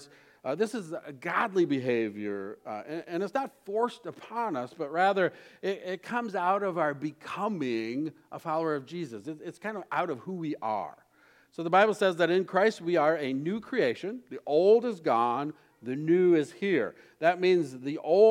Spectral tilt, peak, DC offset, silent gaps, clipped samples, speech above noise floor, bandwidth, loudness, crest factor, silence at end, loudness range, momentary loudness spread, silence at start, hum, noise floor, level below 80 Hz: -6 dB/octave; -8 dBFS; under 0.1%; none; under 0.1%; 34 dB; 12 kHz; -29 LUFS; 20 dB; 0 s; 7 LU; 14 LU; 0 s; none; -62 dBFS; -82 dBFS